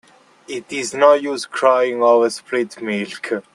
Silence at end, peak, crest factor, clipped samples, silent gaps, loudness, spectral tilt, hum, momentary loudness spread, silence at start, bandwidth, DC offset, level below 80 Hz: 0.15 s; 0 dBFS; 18 dB; under 0.1%; none; -17 LUFS; -3.5 dB/octave; none; 12 LU; 0.5 s; 12 kHz; under 0.1%; -70 dBFS